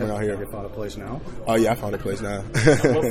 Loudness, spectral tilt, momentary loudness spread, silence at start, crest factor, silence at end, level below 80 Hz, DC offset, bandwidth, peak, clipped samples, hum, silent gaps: -23 LUFS; -6 dB/octave; 15 LU; 0 s; 20 dB; 0 s; -40 dBFS; under 0.1%; 16 kHz; -2 dBFS; under 0.1%; none; none